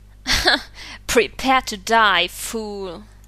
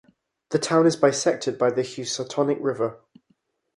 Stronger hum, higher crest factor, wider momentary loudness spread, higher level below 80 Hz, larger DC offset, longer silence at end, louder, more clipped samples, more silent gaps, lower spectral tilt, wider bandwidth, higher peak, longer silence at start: neither; about the same, 20 dB vs 20 dB; first, 17 LU vs 9 LU; first, -38 dBFS vs -70 dBFS; neither; second, 0.25 s vs 0.8 s; first, -18 LUFS vs -23 LUFS; neither; neither; second, -2 dB/octave vs -4.5 dB/octave; first, 14 kHz vs 11.5 kHz; about the same, -2 dBFS vs -4 dBFS; second, 0.25 s vs 0.5 s